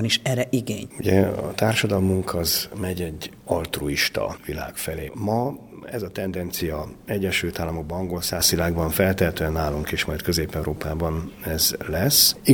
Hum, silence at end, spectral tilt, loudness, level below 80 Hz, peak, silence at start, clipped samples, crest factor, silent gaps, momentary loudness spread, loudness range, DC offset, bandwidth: none; 0 s; -4 dB/octave; -23 LUFS; -40 dBFS; -2 dBFS; 0 s; under 0.1%; 22 dB; none; 10 LU; 4 LU; under 0.1%; over 20 kHz